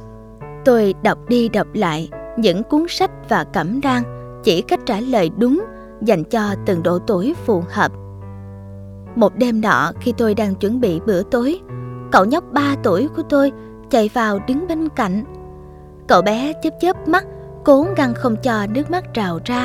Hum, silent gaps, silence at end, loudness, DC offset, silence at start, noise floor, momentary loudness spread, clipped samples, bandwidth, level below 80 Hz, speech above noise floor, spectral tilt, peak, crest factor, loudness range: none; none; 0 s; -18 LUFS; under 0.1%; 0 s; -38 dBFS; 16 LU; under 0.1%; 16 kHz; -44 dBFS; 21 dB; -6 dB/octave; 0 dBFS; 18 dB; 2 LU